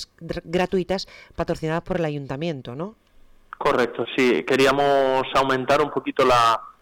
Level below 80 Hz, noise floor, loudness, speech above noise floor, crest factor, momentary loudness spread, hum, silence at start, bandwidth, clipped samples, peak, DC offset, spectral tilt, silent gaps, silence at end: -48 dBFS; -45 dBFS; -22 LUFS; 23 dB; 10 dB; 14 LU; none; 0 s; 19 kHz; under 0.1%; -12 dBFS; under 0.1%; -5 dB/octave; none; 0.1 s